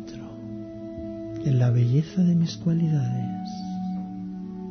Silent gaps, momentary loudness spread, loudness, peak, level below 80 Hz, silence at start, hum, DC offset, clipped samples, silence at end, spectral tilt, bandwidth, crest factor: none; 15 LU; -26 LUFS; -12 dBFS; -56 dBFS; 0 s; none; under 0.1%; under 0.1%; 0 s; -8.5 dB/octave; 6.6 kHz; 14 dB